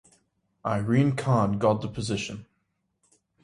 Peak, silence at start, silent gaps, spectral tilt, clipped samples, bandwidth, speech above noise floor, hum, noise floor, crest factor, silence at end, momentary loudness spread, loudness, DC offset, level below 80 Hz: -8 dBFS; 0.65 s; none; -7 dB/octave; under 0.1%; 11.5 kHz; 51 dB; none; -76 dBFS; 18 dB; 1 s; 12 LU; -26 LUFS; under 0.1%; -56 dBFS